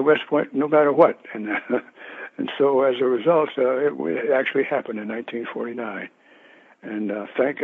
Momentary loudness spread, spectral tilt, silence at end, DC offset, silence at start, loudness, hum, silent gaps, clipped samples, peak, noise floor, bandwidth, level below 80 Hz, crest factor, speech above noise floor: 14 LU; -8 dB/octave; 0 s; under 0.1%; 0 s; -22 LUFS; none; none; under 0.1%; -2 dBFS; -52 dBFS; 4.1 kHz; -78 dBFS; 20 dB; 30 dB